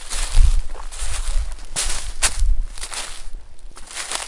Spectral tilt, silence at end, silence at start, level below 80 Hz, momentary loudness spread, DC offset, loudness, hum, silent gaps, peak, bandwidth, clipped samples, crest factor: -1.5 dB/octave; 0 s; 0 s; -22 dBFS; 18 LU; under 0.1%; -25 LUFS; none; none; 0 dBFS; 11.5 kHz; under 0.1%; 18 dB